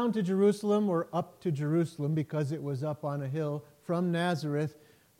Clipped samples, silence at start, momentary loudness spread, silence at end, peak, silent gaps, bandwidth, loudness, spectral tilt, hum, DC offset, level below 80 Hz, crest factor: under 0.1%; 0 s; 8 LU; 0.45 s; -16 dBFS; none; 16 kHz; -31 LUFS; -7.5 dB/octave; none; under 0.1%; -76 dBFS; 16 dB